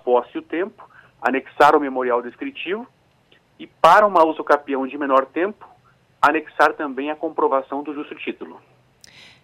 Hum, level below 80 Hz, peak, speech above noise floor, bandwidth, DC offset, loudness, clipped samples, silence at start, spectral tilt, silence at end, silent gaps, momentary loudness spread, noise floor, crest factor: none; -64 dBFS; -2 dBFS; 38 dB; 16 kHz; under 0.1%; -19 LUFS; under 0.1%; 0.05 s; -4.5 dB/octave; 0.85 s; none; 16 LU; -57 dBFS; 18 dB